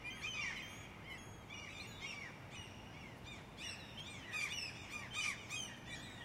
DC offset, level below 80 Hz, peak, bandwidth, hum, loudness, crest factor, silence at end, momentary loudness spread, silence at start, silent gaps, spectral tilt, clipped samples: under 0.1%; -66 dBFS; -28 dBFS; 16 kHz; none; -46 LUFS; 20 dB; 0 s; 11 LU; 0 s; none; -2 dB/octave; under 0.1%